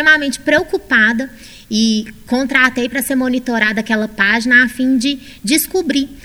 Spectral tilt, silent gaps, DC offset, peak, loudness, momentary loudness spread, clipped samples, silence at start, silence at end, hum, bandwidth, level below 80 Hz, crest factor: -3 dB/octave; none; under 0.1%; 0 dBFS; -14 LUFS; 9 LU; under 0.1%; 0 s; 0.05 s; none; 18 kHz; -44 dBFS; 16 dB